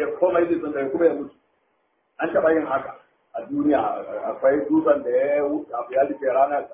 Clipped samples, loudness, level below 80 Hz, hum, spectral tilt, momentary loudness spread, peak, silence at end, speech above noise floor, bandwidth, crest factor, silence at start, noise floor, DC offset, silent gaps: under 0.1%; -22 LUFS; -62 dBFS; none; -10 dB/octave; 10 LU; -6 dBFS; 0 s; 47 dB; 3.8 kHz; 18 dB; 0 s; -69 dBFS; under 0.1%; none